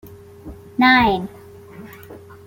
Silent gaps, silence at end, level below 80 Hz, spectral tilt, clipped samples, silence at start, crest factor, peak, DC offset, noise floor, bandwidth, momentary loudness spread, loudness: none; 0.3 s; -46 dBFS; -6 dB/octave; under 0.1%; 0.05 s; 18 dB; -2 dBFS; under 0.1%; -40 dBFS; 16.5 kHz; 27 LU; -15 LUFS